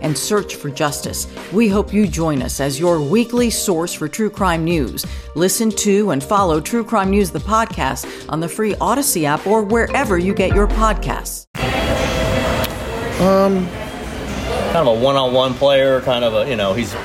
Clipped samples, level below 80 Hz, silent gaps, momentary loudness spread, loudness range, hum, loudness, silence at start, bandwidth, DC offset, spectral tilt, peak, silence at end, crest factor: under 0.1%; -30 dBFS; 11.47-11.54 s; 9 LU; 2 LU; none; -17 LUFS; 0 s; 16.5 kHz; under 0.1%; -4.5 dB/octave; -2 dBFS; 0 s; 14 dB